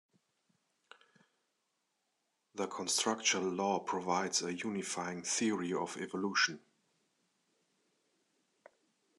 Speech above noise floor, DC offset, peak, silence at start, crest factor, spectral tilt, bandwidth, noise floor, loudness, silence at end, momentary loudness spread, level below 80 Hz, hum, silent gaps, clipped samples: 47 dB; under 0.1%; -16 dBFS; 2.55 s; 22 dB; -2.5 dB/octave; 12.5 kHz; -83 dBFS; -35 LUFS; 2.6 s; 8 LU; -90 dBFS; none; none; under 0.1%